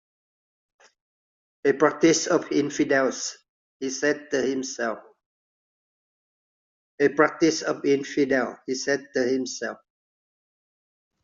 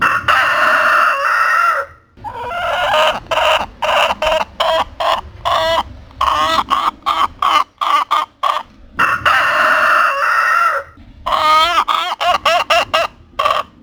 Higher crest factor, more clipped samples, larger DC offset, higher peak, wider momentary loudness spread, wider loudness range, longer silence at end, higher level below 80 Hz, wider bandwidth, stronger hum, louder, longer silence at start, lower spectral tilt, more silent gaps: first, 22 dB vs 14 dB; neither; neither; second, -4 dBFS vs 0 dBFS; first, 11 LU vs 8 LU; first, 6 LU vs 3 LU; first, 1.5 s vs 0.15 s; second, -70 dBFS vs -42 dBFS; second, 7.8 kHz vs over 20 kHz; neither; second, -24 LUFS vs -14 LUFS; first, 1.65 s vs 0 s; first, -3.5 dB/octave vs -2 dB/octave; first, 3.49-3.80 s, 5.26-6.98 s vs none